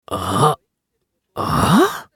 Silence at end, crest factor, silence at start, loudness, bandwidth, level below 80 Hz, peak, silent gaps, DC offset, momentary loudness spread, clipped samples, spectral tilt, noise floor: 0.1 s; 16 dB; 0.1 s; -17 LUFS; 18 kHz; -40 dBFS; -2 dBFS; none; under 0.1%; 14 LU; under 0.1%; -5.5 dB/octave; -74 dBFS